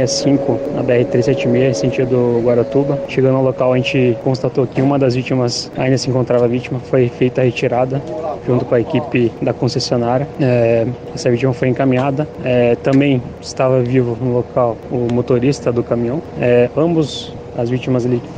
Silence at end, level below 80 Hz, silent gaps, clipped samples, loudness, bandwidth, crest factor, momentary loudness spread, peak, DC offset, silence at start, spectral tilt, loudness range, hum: 0 s; -44 dBFS; none; under 0.1%; -16 LUFS; 9.4 kHz; 12 dB; 5 LU; -2 dBFS; under 0.1%; 0 s; -6.5 dB/octave; 2 LU; none